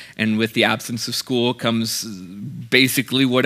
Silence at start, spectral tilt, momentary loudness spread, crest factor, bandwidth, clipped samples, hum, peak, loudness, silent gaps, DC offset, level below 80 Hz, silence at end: 0 s; -4 dB/octave; 15 LU; 20 dB; 16 kHz; under 0.1%; none; 0 dBFS; -19 LUFS; none; under 0.1%; -66 dBFS; 0 s